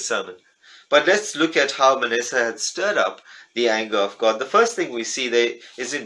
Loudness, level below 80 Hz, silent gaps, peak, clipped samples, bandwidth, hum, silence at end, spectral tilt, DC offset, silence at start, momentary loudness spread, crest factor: -20 LUFS; -78 dBFS; none; -2 dBFS; under 0.1%; 12 kHz; none; 0 s; -1.5 dB/octave; under 0.1%; 0 s; 8 LU; 18 dB